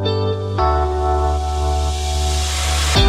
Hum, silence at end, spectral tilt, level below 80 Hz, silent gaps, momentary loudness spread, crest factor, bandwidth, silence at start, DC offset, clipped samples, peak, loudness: none; 0 s; -4.5 dB/octave; -20 dBFS; none; 3 LU; 16 dB; 14 kHz; 0 s; under 0.1%; under 0.1%; -2 dBFS; -19 LUFS